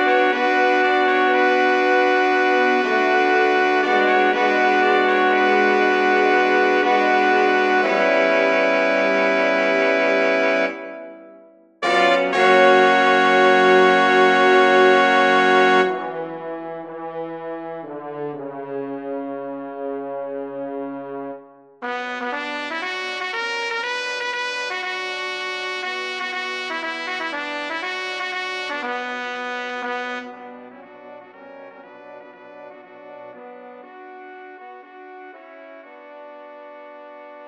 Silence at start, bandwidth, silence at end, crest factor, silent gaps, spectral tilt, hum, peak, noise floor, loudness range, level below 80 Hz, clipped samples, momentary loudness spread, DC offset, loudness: 0 s; 9.4 kHz; 0 s; 18 dB; none; -4 dB/octave; none; -2 dBFS; -48 dBFS; 15 LU; -68 dBFS; under 0.1%; 18 LU; under 0.1%; -18 LUFS